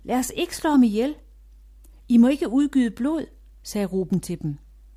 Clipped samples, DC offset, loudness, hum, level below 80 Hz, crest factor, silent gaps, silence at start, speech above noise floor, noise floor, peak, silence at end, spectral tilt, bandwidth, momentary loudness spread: under 0.1%; under 0.1%; -22 LUFS; none; -48 dBFS; 16 dB; none; 0.05 s; 27 dB; -48 dBFS; -8 dBFS; 0.4 s; -5.5 dB/octave; 15.5 kHz; 15 LU